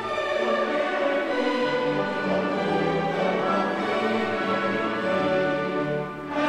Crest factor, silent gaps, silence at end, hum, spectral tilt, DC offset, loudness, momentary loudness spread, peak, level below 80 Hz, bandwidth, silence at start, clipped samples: 14 dB; none; 0 s; none; -6 dB/octave; under 0.1%; -25 LUFS; 3 LU; -12 dBFS; -60 dBFS; 11 kHz; 0 s; under 0.1%